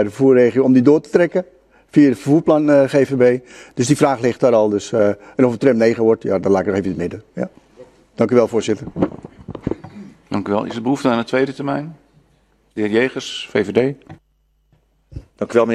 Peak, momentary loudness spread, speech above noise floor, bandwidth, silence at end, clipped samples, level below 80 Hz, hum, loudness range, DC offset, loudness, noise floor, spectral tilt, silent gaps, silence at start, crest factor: 0 dBFS; 15 LU; 46 dB; 12.5 kHz; 0 s; under 0.1%; -52 dBFS; none; 7 LU; under 0.1%; -17 LUFS; -61 dBFS; -6.5 dB/octave; none; 0 s; 16 dB